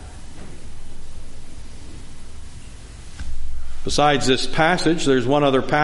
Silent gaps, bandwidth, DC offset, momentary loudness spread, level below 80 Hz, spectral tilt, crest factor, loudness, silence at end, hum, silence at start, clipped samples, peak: none; 11.5 kHz; under 0.1%; 24 LU; -30 dBFS; -4.5 dB/octave; 18 dB; -19 LUFS; 0 s; none; 0 s; under 0.1%; -2 dBFS